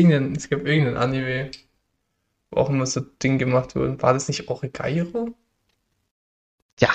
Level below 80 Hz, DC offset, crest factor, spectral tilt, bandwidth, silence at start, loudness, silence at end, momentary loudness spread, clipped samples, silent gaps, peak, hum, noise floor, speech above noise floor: -50 dBFS; under 0.1%; 22 dB; -6 dB/octave; 8.8 kHz; 0 s; -23 LUFS; 0 s; 9 LU; under 0.1%; 6.11-6.77 s; -2 dBFS; none; -74 dBFS; 52 dB